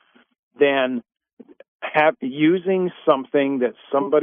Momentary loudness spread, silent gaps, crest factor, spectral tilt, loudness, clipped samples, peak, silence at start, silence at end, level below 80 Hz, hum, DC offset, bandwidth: 6 LU; 1.33-1.37 s, 1.68-1.80 s; 18 dB; -9 dB/octave; -20 LUFS; under 0.1%; -2 dBFS; 0.6 s; 0 s; -76 dBFS; none; under 0.1%; 3.9 kHz